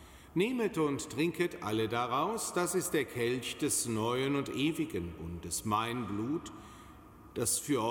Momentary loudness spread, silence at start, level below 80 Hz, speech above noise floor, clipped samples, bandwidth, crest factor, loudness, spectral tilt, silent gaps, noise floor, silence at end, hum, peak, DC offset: 8 LU; 0 s; -60 dBFS; 20 dB; under 0.1%; 17 kHz; 16 dB; -33 LUFS; -4 dB/octave; none; -54 dBFS; 0 s; none; -18 dBFS; under 0.1%